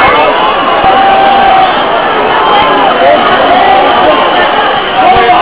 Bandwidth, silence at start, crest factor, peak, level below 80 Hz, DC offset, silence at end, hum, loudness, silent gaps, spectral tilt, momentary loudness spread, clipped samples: 4 kHz; 0 s; 6 dB; 0 dBFS; -34 dBFS; 2%; 0 s; none; -6 LUFS; none; -7.5 dB/octave; 3 LU; 6%